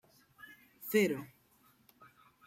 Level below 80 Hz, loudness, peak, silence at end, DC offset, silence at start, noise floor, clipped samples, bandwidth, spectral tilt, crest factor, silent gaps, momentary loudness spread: -80 dBFS; -33 LUFS; -18 dBFS; 1.2 s; under 0.1%; 0.5 s; -68 dBFS; under 0.1%; 16 kHz; -5 dB/octave; 22 dB; none; 24 LU